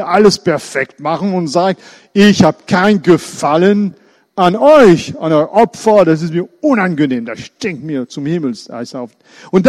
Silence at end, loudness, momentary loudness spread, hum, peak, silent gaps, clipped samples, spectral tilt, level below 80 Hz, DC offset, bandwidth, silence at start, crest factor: 0 s; -12 LUFS; 14 LU; none; 0 dBFS; none; 0.1%; -6 dB/octave; -48 dBFS; under 0.1%; 13 kHz; 0 s; 12 dB